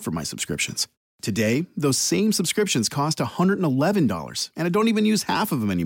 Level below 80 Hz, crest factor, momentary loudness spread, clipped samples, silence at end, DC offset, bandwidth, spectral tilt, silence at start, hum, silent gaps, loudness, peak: -56 dBFS; 12 dB; 7 LU; under 0.1%; 0 s; under 0.1%; 17 kHz; -4.5 dB/octave; 0 s; none; 0.97-1.19 s; -23 LUFS; -10 dBFS